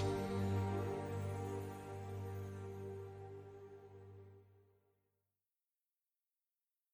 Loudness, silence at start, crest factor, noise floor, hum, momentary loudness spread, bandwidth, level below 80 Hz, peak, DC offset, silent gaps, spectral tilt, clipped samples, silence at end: -44 LUFS; 0 s; 18 dB; under -90 dBFS; none; 19 LU; 15 kHz; -68 dBFS; -28 dBFS; under 0.1%; none; -7.5 dB/octave; under 0.1%; 2.3 s